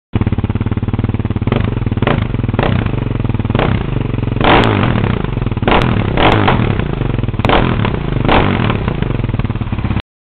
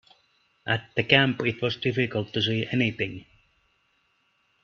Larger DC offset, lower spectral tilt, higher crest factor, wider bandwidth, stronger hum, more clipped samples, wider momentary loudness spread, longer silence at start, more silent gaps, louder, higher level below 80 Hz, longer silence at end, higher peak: neither; about the same, -5.5 dB/octave vs -6.5 dB/octave; second, 14 dB vs 26 dB; second, 5.4 kHz vs 7 kHz; neither; neither; second, 7 LU vs 12 LU; second, 0.15 s vs 0.65 s; neither; first, -15 LUFS vs -25 LUFS; first, -22 dBFS vs -62 dBFS; second, 0.3 s vs 1.4 s; about the same, 0 dBFS vs -2 dBFS